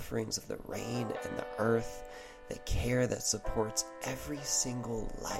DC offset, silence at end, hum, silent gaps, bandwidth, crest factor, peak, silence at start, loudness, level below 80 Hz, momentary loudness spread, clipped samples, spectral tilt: under 0.1%; 0 s; none; none; 16 kHz; 18 dB; -18 dBFS; 0 s; -35 LUFS; -46 dBFS; 13 LU; under 0.1%; -3.5 dB/octave